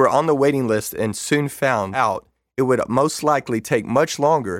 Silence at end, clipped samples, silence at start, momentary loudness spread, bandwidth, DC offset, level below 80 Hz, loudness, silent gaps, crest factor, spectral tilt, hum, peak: 0 s; under 0.1%; 0 s; 6 LU; 17 kHz; under 0.1%; -56 dBFS; -20 LUFS; none; 16 dB; -5 dB/octave; none; -4 dBFS